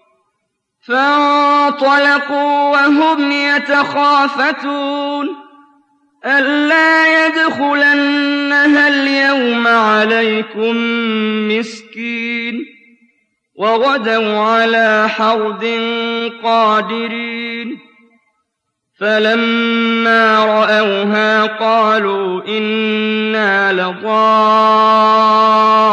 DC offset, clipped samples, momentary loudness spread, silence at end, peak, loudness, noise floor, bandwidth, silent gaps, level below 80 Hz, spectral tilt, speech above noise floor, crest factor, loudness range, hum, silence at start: under 0.1%; under 0.1%; 10 LU; 0 s; -2 dBFS; -12 LUFS; -73 dBFS; 9.4 kHz; none; -70 dBFS; -4.5 dB/octave; 60 dB; 10 dB; 6 LU; none; 0.9 s